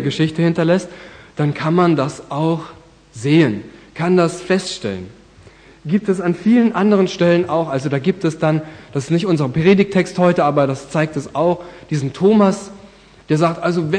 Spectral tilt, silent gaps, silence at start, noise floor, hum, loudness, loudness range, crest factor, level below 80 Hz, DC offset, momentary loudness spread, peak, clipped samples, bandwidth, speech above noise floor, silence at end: -7 dB/octave; none; 0 s; -44 dBFS; none; -17 LUFS; 2 LU; 16 dB; -52 dBFS; under 0.1%; 12 LU; -2 dBFS; under 0.1%; 10 kHz; 28 dB; 0 s